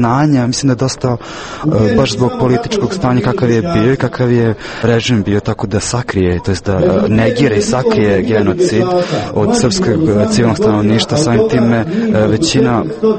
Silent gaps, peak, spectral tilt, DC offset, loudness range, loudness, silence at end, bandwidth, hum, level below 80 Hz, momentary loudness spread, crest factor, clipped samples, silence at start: none; 0 dBFS; -6 dB/octave; under 0.1%; 2 LU; -13 LUFS; 0 s; 8.8 kHz; none; -36 dBFS; 5 LU; 12 dB; under 0.1%; 0 s